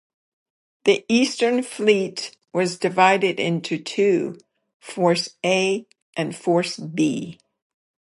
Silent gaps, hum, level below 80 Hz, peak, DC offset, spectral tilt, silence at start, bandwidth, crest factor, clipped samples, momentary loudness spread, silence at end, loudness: 4.74-4.80 s, 6.02-6.13 s; none; -72 dBFS; -2 dBFS; under 0.1%; -4.5 dB/octave; 0.85 s; 11.5 kHz; 20 dB; under 0.1%; 11 LU; 0.85 s; -21 LUFS